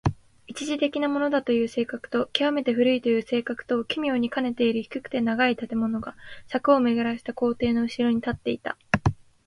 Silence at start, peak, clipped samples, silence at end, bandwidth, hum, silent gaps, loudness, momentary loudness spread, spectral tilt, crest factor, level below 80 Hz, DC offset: 0.05 s; -4 dBFS; under 0.1%; 0.3 s; 11.5 kHz; none; none; -25 LUFS; 8 LU; -6 dB/octave; 22 dB; -50 dBFS; under 0.1%